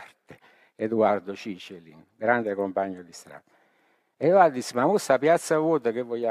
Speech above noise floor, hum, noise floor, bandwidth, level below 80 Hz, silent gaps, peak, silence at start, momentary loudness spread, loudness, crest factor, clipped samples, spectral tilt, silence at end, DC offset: 43 dB; none; -67 dBFS; 15 kHz; -76 dBFS; none; -6 dBFS; 0 s; 18 LU; -24 LUFS; 20 dB; under 0.1%; -5.5 dB/octave; 0 s; under 0.1%